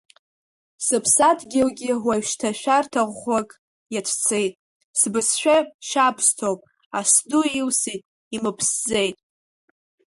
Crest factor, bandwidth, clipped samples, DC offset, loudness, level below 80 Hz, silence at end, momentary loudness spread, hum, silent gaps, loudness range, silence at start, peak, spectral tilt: 20 dB; 12 kHz; under 0.1%; under 0.1%; -21 LUFS; -62 dBFS; 1.05 s; 11 LU; none; 3.59-3.86 s, 4.55-4.94 s, 5.74-5.79 s, 6.86-6.91 s, 8.05-8.31 s; 3 LU; 0.8 s; -4 dBFS; -2 dB/octave